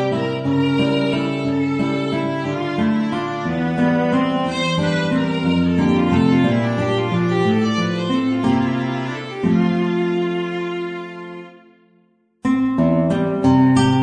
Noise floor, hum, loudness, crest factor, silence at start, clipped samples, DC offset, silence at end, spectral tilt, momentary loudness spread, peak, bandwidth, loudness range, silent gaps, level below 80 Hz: -59 dBFS; none; -19 LUFS; 14 dB; 0 s; under 0.1%; under 0.1%; 0 s; -7 dB/octave; 8 LU; -4 dBFS; 9.4 kHz; 5 LU; none; -48 dBFS